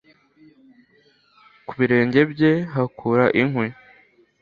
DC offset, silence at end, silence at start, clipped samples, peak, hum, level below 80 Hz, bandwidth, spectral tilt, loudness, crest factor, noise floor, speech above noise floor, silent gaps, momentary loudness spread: under 0.1%; 0.7 s; 1.7 s; under 0.1%; -2 dBFS; none; -60 dBFS; 6.8 kHz; -9 dB/octave; -20 LUFS; 20 dB; -59 dBFS; 40 dB; none; 11 LU